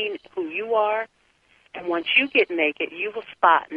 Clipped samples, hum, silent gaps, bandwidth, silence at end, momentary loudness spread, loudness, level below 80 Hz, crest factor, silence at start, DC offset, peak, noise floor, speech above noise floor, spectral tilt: under 0.1%; none; none; 5.2 kHz; 0 s; 13 LU; -22 LUFS; -70 dBFS; 20 dB; 0 s; under 0.1%; -4 dBFS; -61 dBFS; 39 dB; -5 dB/octave